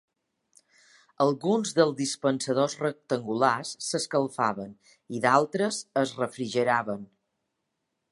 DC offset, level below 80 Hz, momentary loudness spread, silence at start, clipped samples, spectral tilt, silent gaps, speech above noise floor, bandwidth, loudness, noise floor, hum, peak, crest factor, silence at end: under 0.1%; -74 dBFS; 8 LU; 1.2 s; under 0.1%; -4.5 dB/octave; none; 54 dB; 11.5 kHz; -27 LUFS; -81 dBFS; none; -6 dBFS; 22 dB; 1.05 s